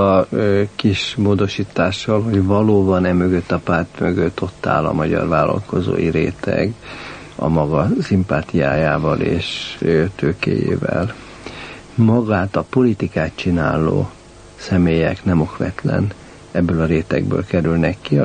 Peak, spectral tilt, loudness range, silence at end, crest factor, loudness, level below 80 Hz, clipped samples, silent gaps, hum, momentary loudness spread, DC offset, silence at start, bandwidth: -2 dBFS; -7.5 dB/octave; 2 LU; 0 s; 16 dB; -18 LUFS; -38 dBFS; under 0.1%; none; none; 8 LU; under 0.1%; 0 s; 9.6 kHz